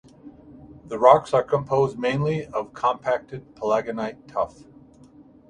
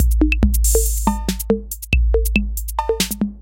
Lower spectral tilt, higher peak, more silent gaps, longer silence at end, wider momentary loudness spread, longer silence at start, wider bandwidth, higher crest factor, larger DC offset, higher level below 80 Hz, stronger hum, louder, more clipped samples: first, -7 dB/octave vs -4.5 dB/octave; about the same, 0 dBFS vs -2 dBFS; neither; first, 1 s vs 0 s; first, 14 LU vs 6 LU; first, 0.25 s vs 0 s; second, 10 kHz vs 17 kHz; first, 24 dB vs 16 dB; neither; second, -58 dBFS vs -20 dBFS; neither; second, -23 LUFS vs -19 LUFS; neither